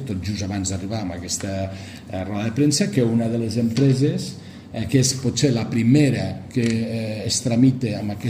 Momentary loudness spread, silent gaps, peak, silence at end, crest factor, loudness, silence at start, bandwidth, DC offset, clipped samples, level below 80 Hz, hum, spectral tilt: 11 LU; none; -4 dBFS; 0 s; 18 dB; -21 LUFS; 0 s; 15.5 kHz; under 0.1%; under 0.1%; -50 dBFS; none; -5.5 dB/octave